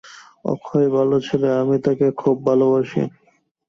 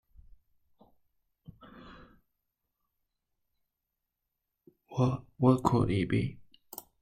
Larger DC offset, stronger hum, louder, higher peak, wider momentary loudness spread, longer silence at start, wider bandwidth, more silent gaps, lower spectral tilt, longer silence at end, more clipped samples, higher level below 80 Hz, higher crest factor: neither; neither; first, -19 LUFS vs -29 LUFS; first, -4 dBFS vs -8 dBFS; second, 10 LU vs 26 LU; second, 0.05 s vs 1.75 s; second, 7.2 kHz vs 14.5 kHz; neither; about the same, -8 dB/octave vs -8 dB/octave; about the same, 0.6 s vs 0.7 s; neither; about the same, -60 dBFS vs -56 dBFS; second, 16 dB vs 26 dB